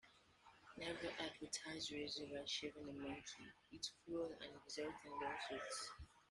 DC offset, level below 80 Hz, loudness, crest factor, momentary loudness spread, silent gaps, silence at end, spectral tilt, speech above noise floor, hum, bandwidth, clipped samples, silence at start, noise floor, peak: under 0.1%; -74 dBFS; -49 LUFS; 20 dB; 13 LU; none; 0.05 s; -2.5 dB/octave; 20 dB; none; 12 kHz; under 0.1%; 0.05 s; -70 dBFS; -32 dBFS